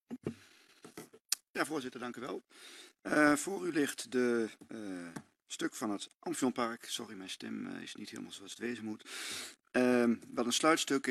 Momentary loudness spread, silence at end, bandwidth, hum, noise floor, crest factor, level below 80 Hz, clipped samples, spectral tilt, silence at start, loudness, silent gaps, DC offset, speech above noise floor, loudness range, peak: 18 LU; 0 s; 14 kHz; none; -62 dBFS; 24 dB; -78 dBFS; under 0.1%; -3 dB/octave; 0.1 s; -35 LUFS; 1.50-1.54 s, 6.15-6.20 s; under 0.1%; 27 dB; 6 LU; -12 dBFS